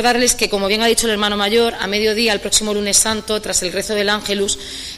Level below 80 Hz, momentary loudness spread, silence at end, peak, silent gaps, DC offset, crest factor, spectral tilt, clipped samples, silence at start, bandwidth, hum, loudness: -40 dBFS; 5 LU; 0 s; 0 dBFS; none; under 0.1%; 16 dB; -1.5 dB/octave; under 0.1%; 0 s; 15.5 kHz; none; -16 LUFS